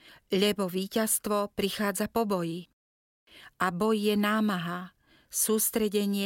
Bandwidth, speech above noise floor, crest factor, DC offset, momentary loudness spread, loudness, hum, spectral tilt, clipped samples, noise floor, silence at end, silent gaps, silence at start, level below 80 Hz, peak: 17 kHz; over 62 dB; 18 dB; under 0.1%; 9 LU; -28 LUFS; none; -4 dB/octave; under 0.1%; under -90 dBFS; 0 s; 2.73-3.27 s; 0.1 s; -62 dBFS; -10 dBFS